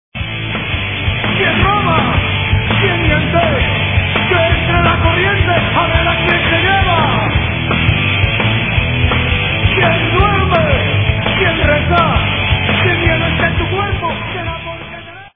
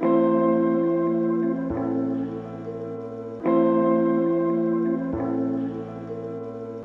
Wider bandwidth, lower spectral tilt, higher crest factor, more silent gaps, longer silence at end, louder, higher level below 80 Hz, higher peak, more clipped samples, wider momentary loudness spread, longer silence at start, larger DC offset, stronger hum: about the same, 3.8 kHz vs 3.9 kHz; second, -9 dB/octave vs -10.5 dB/octave; about the same, 14 dB vs 14 dB; neither; about the same, 0.05 s vs 0 s; first, -13 LUFS vs -24 LUFS; first, -24 dBFS vs -54 dBFS; first, 0 dBFS vs -10 dBFS; neither; second, 6 LU vs 14 LU; first, 0.15 s vs 0 s; first, 0.4% vs under 0.1%; neither